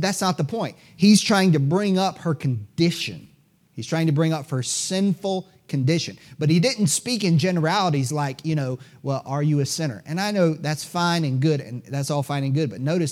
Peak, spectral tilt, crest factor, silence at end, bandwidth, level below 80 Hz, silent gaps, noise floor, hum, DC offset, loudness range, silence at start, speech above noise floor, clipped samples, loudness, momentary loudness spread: -6 dBFS; -5 dB/octave; 16 dB; 0 s; 15.5 kHz; -68 dBFS; none; -58 dBFS; none; under 0.1%; 3 LU; 0 s; 36 dB; under 0.1%; -22 LUFS; 10 LU